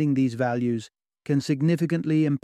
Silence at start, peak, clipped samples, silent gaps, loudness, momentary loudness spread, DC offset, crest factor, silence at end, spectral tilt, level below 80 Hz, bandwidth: 0 s; -12 dBFS; under 0.1%; none; -25 LUFS; 6 LU; under 0.1%; 12 dB; 0.05 s; -7.5 dB/octave; -66 dBFS; 12 kHz